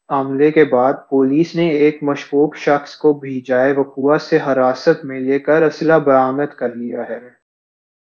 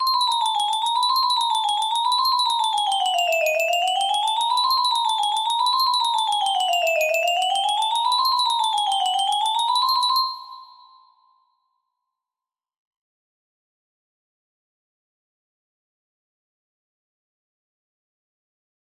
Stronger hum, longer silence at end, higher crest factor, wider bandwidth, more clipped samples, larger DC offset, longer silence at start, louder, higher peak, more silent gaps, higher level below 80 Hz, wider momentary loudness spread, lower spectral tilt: neither; second, 0.75 s vs 8.25 s; about the same, 16 dB vs 14 dB; second, 7 kHz vs 16 kHz; neither; neither; about the same, 0.1 s vs 0 s; first, -16 LUFS vs -20 LUFS; first, 0 dBFS vs -8 dBFS; neither; first, -68 dBFS vs -78 dBFS; first, 10 LU vs 2 LU; first, -7 dB/octave vs 3 dB/octave